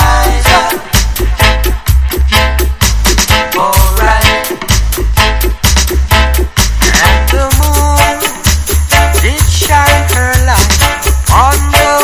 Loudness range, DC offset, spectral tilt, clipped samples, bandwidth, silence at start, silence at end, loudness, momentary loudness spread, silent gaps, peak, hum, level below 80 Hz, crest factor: 1 LU; under 0.1%; -3.5 dB/octave; 1%; 16 kHz; 0 s; 0 s; -9 LUFS; 4 LU; none; 0 dBFS; none; -12 dBFS; 8 dB